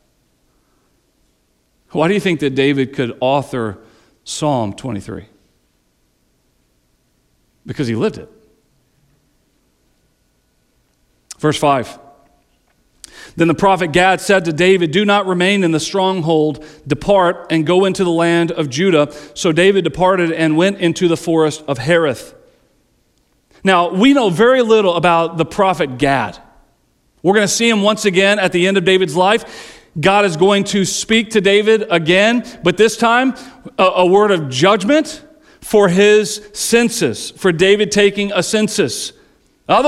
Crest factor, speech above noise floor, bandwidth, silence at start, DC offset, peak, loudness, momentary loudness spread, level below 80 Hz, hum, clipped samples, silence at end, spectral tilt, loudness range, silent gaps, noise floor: 14 dB; 47 dB; 14 kHz; 1.95 s; under 0.1%; -2 dBFS; -14 LUFS; 11 LU; -48 dBFS; none; under 0.1%; 0 s; -4.5 dB/octave; 13 LU; none; -61 dBFS